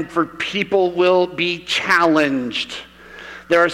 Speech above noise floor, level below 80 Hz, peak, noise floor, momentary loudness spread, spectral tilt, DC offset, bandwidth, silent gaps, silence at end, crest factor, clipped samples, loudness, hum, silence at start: 19 dB; -56 dBFS; -4 dBFS; -38 dBFS; 17 LU; -4.5 dB/octave; under 0.1%; 15 kHz; none; 0 s; 14 dB; under 0.1%; -18 LUFS; none; 0 s